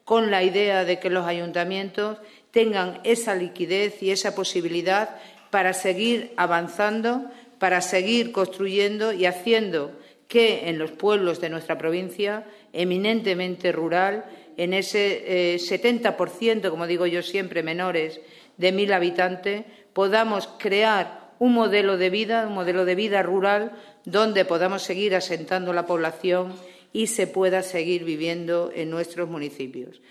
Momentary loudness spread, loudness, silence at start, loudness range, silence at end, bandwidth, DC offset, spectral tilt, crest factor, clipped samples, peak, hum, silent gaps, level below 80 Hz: 9 LU; -23 LUFS; 0.05 s; 3 LU; 0.2 s; 14 kHz; under 0.1%; -4 dB/octave; 20 dB; under 0.1%; -4 dBFS; none; none; -76 dBFS